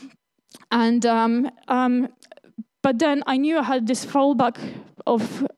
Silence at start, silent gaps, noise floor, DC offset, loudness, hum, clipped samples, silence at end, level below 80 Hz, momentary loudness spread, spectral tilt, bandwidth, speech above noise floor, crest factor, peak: 0 s; none; -53 dBFS; under 0.1%; -22 LUFS; none; under 0.1%; 0.1 s; -74 dBFS; 12 LU; -5 dB/octave; 12 kHz; 32 dB; 16 dB; -6 dBFS